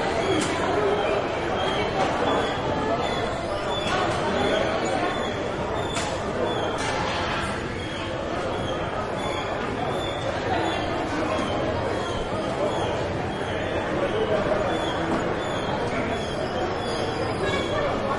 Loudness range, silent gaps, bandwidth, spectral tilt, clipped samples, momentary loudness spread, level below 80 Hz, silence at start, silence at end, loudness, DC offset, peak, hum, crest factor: 3 LU; none; 11.5 kHz; -5 dB/octave; under 0.1%; 4 LU; -44 dBFS; 0 s; 0 s; -26 LUFS; under 0.1%; -10 dBFS; none; 16 dB